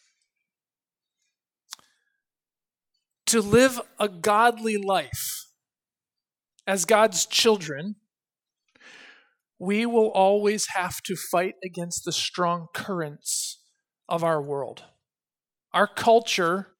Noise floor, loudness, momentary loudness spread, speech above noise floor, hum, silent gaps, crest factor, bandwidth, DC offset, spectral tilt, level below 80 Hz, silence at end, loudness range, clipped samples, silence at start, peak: under -90 dBFS; -24 LUFS; 15 LU; over 66 dB; none; none; 22 dB; 19 kHz; under 0.1%; -3 dB/octave; -62 dBFS; 0.15 s; 5 LU; under 0.1%; 1.7 s; -4 dBFS